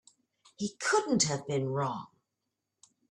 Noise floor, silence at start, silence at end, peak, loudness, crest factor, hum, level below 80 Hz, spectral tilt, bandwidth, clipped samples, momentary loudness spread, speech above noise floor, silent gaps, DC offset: -86 dBFS; 0.6 s; 1.05 s; -14 dBFS; -31 LUFS; 20 dB; none; -72 dBFS; -3.5 dB/octave; 11.5 kHz; under 0.1%; 11 LU; 55 dB; none; under 0.1%